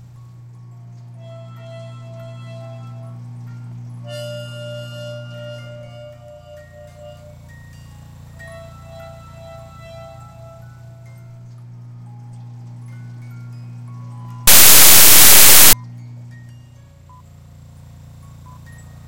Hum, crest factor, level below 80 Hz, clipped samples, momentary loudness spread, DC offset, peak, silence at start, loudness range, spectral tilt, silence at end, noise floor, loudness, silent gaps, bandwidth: none; 16 dB; -42 dBFS; 0.7%; 31 LU; under 0.1%; 0 dBFS; 1.7 s; 26 LU; -0.5 dB/octave; 3.1 s; -43 dBFS; -5 LUFS; none; over 20 kHz